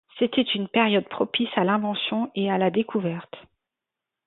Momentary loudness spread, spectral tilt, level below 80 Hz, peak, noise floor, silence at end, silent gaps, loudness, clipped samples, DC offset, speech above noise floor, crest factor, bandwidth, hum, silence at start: 6 LU; -10 dB/octave; -70 dBFS; -6 dBFS; -87 dBFS; 0.85 s; none; -24 LUFS; under 0.1%; under 0.1%; 63 dB; 18 dB; 4.2 kHz; none; 0.15 s